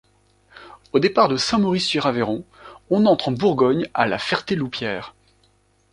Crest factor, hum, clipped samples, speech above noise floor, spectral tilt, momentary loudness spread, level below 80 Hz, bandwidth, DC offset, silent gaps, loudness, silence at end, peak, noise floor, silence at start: 20 dB; none; under 0.1%; 41 dB; -5.5 dB/octave; 9 LU; -56 dBFS; 11 kHz; under 0.1%; none; -20 LUFS; 0.8 s; -2 dBFS; -61 dBFS; 0.55 s